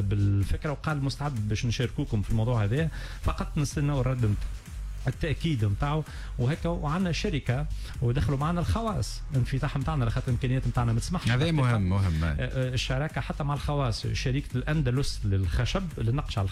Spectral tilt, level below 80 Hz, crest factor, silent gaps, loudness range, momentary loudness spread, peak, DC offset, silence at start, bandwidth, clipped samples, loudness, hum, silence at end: -6.5 dB/octave; -36 dBFS; 12 dB; none; 2 LU; 5 LU; -16 dBFS; under 0.1%; 0 s; 13.5 kHz; under 0.1%; -29 LUFS; none; 0 s